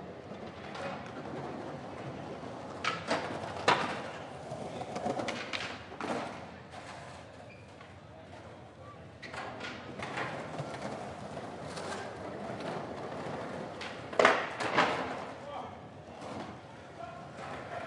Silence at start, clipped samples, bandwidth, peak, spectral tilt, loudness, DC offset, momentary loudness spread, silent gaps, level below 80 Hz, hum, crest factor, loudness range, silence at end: 0 s; under 0.1%; 11.5 kHz; -4 dBFS; -4.5 dB/octave; -37 LUFS; under 0.1%; 20 LU; none; -70 dBFS; none; 34 dB; 11 LU; 0 s